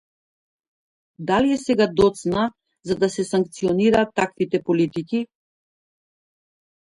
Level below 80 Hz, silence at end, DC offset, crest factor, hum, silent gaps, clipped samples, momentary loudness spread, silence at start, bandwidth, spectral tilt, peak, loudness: -52 dBFS; 1.65 s; under 0.1%; 18 dB; none; none; under 0.1%; 9 LU; 1.2 s; 11.5 kHz; -6 dB/octave; -6 dBFS; -21 LUFS